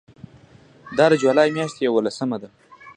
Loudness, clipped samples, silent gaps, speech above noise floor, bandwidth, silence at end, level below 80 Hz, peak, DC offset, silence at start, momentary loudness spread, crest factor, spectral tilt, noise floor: -20 LUFS; under 0.1%; none; 31 dB; 10 kHz; 0.05 s; -64 dBFS; -2 dBFS; under 0.1%; 0.85 s; 11 LU; 20 dB; -5.5 dB/octave; -50 dBFS